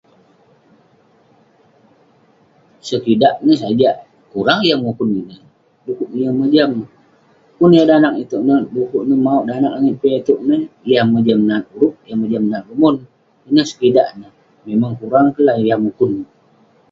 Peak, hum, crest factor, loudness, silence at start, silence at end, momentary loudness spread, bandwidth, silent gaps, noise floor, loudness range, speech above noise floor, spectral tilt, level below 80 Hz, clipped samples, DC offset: 0 dBFS; none; 16 dB; -15 LUFS; 2.85 s; 0.65 s; 11 LU; 7.6 kHz; none; -53 dBFS; 4 LU; 39 dB; -7 dB/octave; -58 dBFS; under 0.1%; under 0.1%